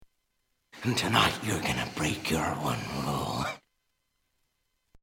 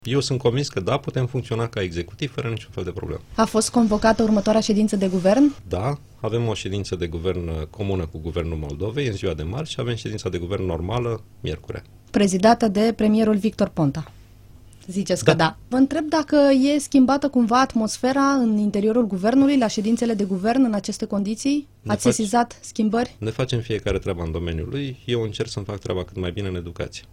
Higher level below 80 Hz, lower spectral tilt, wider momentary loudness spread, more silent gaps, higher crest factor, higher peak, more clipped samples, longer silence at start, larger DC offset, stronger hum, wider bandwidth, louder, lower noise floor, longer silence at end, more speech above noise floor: second, -52 dBFS vs -44 dBFS; second, -4 dB/octave vs -6 dB/octave; about the same, 9 LU vs 11 LU; neither; about the same, 22 dB vs 20 dB; second, -8 dBFS vs -2 dBFS; neither; first, 0.75 s vs 0.05 s; neither; neither; first, 17 kHz vs 15 kHz; second, -29 LUFS vs -22 LUFS; first, -77 dBFS vs -46 dBFS; first, 1.45 s vs 0.1 s; first, 48 dB vs 25 dB